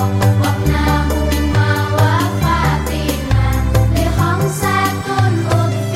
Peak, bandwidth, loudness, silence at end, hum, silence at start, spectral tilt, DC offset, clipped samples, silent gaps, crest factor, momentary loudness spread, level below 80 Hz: -2 dBFS; 16 kHz; -15 LUFS; 0 s; none; 0 s; -6 dB/octave; under 0.1%; under 0.1%; none; 12 dB; 2 LU; -22 dBFS